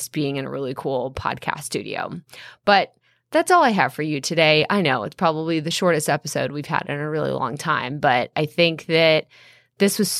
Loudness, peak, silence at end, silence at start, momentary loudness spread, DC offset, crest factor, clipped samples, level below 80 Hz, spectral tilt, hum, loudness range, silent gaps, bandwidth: -21 LUFS; -2 dBFS; 0 s; 0 s; 11 LU; under 0.1%; 20 dB; under 0.1%; -58 dBFS; -4 dB/octave; none; 3 LU; none; 16 kHz